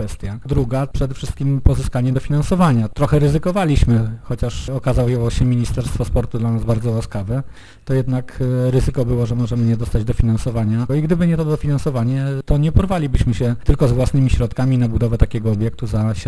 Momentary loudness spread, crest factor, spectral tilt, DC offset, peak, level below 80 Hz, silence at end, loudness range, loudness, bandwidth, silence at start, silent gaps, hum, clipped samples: 7 LU; 16 dB; -8 dB/octave; under 0.1%; 0 dBFS; -24 dBFS; 0 s; 3 LU; -18 LUFS; 11 kHz; 0 s; none; none; under 0.1%